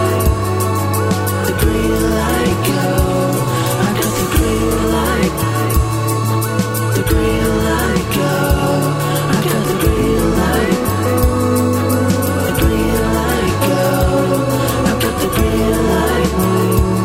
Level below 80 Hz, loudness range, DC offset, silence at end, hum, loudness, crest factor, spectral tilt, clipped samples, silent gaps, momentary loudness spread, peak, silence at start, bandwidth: -24 dBFS; 1 LU; under 0.1%; 0 s; none; -15 LUFS; 12 dB; -5.5 dB/octave; under 0.1%; none; 2 LU; -2 dBFS; 0 s; 16.5 kHz